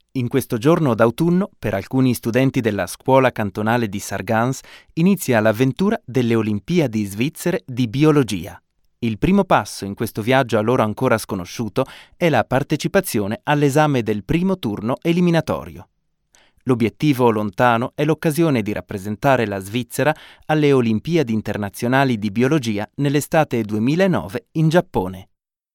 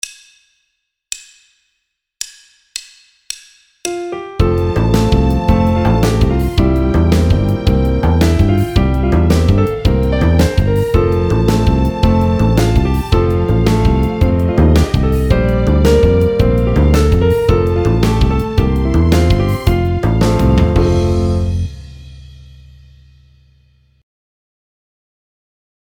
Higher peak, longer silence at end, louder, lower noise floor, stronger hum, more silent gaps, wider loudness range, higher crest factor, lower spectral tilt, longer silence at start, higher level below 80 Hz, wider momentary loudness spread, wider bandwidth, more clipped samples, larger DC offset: about the same, 0 dBFS vs 0 dBFS; second, 0.5 s vs 3.75 s; second, -19 LUFS vs -13 LUFS; second, -59 dBFS vs -70 dBFS; neither; neither; second, 1 LU vs 10 LU; about the same, 18 dB vs 14 dB; about the same, -6.5 dB/octave vs -7 dB/octave; about the same, 0.15 s vs 0.05 s; second, -48 dBFS vs -18 dBFS; second, 9 LU vs 13 LU; about the same, 18 kHz vs 18.5 kHz; neither; neither